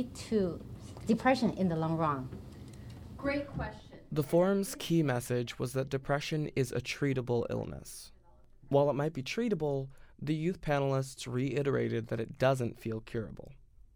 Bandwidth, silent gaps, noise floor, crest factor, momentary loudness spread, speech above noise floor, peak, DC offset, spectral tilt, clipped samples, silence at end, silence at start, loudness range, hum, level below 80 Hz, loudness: over 20 kHz; none; -58 dBFS; 18 dB; 17 LU; 26 dB; -16 dBFS; under 0.1%; -6.5 dB/octave; under 0.1%; 0.3 s; 0 s; 2 LU; none; -56 dBFS; -33 LUFS